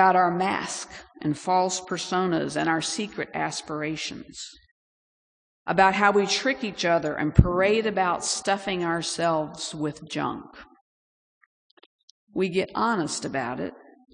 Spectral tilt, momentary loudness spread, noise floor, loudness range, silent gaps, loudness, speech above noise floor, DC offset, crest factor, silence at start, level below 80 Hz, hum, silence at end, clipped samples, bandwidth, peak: -4.5 dB/octave; 13 LU; under -90 dBFS; 8 LU; 4.71-5.66 s, 10.81-11.77 s, 11.86-12.27 s; -25 LUFS; over 65 dB; under 0.1%; 26 dB; 0 s; -42 dBFS; none; 0.4 s; under 0.1%; 10.5 kHz; 0 dBFS